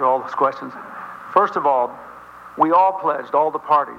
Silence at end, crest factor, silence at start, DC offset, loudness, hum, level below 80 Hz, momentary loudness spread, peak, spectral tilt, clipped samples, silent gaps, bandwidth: 0 s; 18 dB; 0 s; under 0.1%; -19 LUFS; none; -66 dBFS; 20 LU; -2 dBFS; -6.5 dB/octave; under 0.1%; none; 7.6 kHz